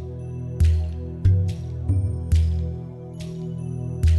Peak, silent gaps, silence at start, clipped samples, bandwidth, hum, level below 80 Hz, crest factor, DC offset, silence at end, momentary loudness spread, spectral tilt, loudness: -8 dBFS; none; 0 s; under 0.1%; 11.5 kHz; none; -26 dBFS; 14 dB; under 0.1%; 0 s; 12 LU; -8 dB/octave; -25 LUFS